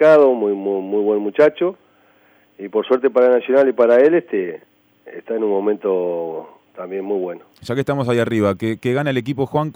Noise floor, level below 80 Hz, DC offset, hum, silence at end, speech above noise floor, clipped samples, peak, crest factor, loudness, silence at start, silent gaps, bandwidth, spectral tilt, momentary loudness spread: -54 dBFS; -64 dBFS; under 0.1%; none; 0.05 s; 37 dB; under 0.1%; -2 dBFS; 16 dB; -18 LUFS; 0 s; none; over 20 kHz; -7.5 dB/octave; 15 LU